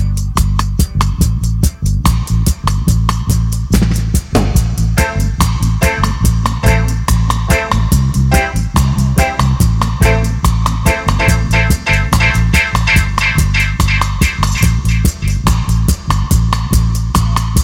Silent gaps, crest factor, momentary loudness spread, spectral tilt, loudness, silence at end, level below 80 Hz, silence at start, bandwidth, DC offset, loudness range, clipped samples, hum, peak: none; 12 dB; 3 LU; -5 dB/octave; -13 LUFS; 0 s; -16 dBFS; 0 s; 17 kHz; under 0.1%; 2 LU; under 0.1%; none; 0 dBFS